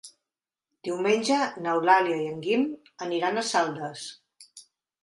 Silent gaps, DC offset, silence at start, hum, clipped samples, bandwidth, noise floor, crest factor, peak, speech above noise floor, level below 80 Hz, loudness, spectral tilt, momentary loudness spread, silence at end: none; under 0.1%; 0.05 s; none; under 0.1%; 11.5 kHz; -90 dBFS; 22 dB; -6 dBFS; 64 dB; -78 dBFS; -26 LUFS; -4 dB/octave; 15 LU; 0.45 s